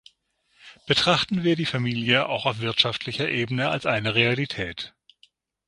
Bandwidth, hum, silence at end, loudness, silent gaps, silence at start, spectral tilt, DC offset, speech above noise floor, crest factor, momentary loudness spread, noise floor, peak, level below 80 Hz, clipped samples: 11.5 kHz; none; 0.8 s; -23 LUFS; none; 0.65 s; -5 dB/octave; under 0.1%; 43 dB; 22 dB; 8 LU; -67 dBFS; -2 dBFS; -56 dBFS; under 0.1%